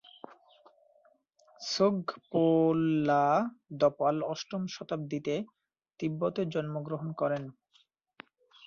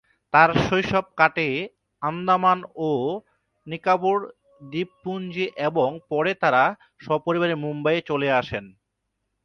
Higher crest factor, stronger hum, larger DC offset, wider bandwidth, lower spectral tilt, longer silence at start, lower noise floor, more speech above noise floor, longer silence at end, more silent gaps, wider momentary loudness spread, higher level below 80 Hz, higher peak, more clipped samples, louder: about the same, 18 dB vs 22 dB; neither; neither; second, 7.4 kHz vs 10 kHz; about the same, -6.5 dB/octave vs -6.5 dB/octave; about the same, 0.3 s vs 0.35 s; second, -69 dBFS vs -78 dBFS; second, 40 dB vs 55 dB; first, 1.15 s vs 0.75 s; neither; about the same, 11 LU vs 12 LU; second, -72 dBFS vs -54 dBFS; second, -14 dBFS vs -2 dBFS; neither; second, -30 LUFS vs -23 LUFS